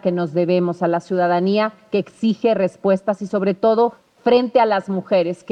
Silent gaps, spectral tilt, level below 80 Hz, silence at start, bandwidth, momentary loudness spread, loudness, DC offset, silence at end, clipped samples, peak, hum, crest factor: none; -7.5 dB/octave; -64 dBFS; 0.05 s; 9.2 kHz; 5 LU; -19 LUFS; under 0.1%; 0 s; under 0.1%; -4 dBFS; none; 14 dB